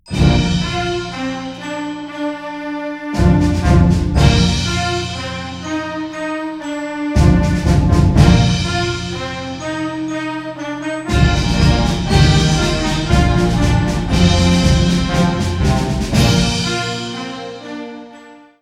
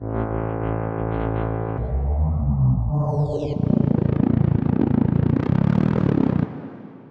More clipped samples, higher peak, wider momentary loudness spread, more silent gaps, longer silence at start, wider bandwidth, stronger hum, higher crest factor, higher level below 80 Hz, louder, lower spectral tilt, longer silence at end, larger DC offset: neither; first, 0 dBFS vs -8 dBFS; first, 12 LU vs 6 LU; neither; about the same, 0.05 s vs 0 s; first, 13 kHz vs 5.2 kHz; neither; about the same, 16 dB vs 12 dB; first, -22 dBFS vs -32 dBFS; first, -16 LUFS vs -22 LUFS; second, -5.5 dB/octave vs -11 dB/octave; first, 0.25 s vs 0 s; neither